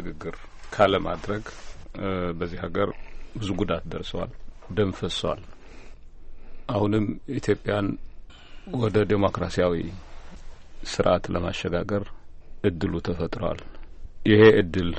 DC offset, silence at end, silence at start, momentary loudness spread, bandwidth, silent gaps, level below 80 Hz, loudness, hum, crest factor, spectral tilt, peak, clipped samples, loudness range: under 0.1%; 0 s; 0 s; 17 LU; 8.4 kHz; none; -40 dBFS; -25 LUFS; none; 22 dB; -6.5 dB/octave; -4 dBFS; under 0.1%; 5 LU